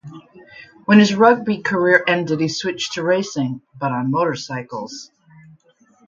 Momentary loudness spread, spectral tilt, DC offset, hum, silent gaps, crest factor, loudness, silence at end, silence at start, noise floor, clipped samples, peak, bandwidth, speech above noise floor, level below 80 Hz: 16 LU; -5 dB/octave; under 0.1%; none; none; 18 dB; -18 LUFS; 1.05 s; 0.05 s; -56 dBFS; under 0.1%; 0 dBFS; 7.6 kHz; 38 dB; -62 dBFS